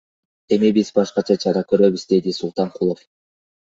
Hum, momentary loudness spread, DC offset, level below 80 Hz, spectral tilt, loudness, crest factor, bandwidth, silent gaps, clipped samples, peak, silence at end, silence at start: none; 7 LU; under 0.1%; -60 dBFS; -6.5 dB/octave; -19 LUFS; 18 dB; 7.8 kHz; none; under 0.1%; -2 dBFS; 0.65 s; 0.5 s